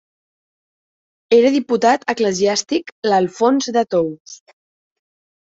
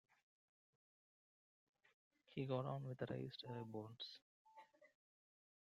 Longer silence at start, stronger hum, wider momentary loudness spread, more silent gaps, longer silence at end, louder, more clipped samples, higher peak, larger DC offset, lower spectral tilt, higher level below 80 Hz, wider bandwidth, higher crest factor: second, 1.3 s vs 2.3 s; neither; second, 7 LU vs 22 LU; second, 2.92-3.03 s, 4.20-4.25 s vs 4.22-4.45 s; first, 1.25 s vs 0.85 s; first, -17 LUFS vs -49 LUFS; neither; first, -2 dBFS vs -30 dBFS; neither; second, -4 dB/octave vs -7.5 dB/octave; first, -64 dBFS vs -86 dBFS; about the same, 8 kHz vs 7.4 kHz; second, 16 dB vs 22 dB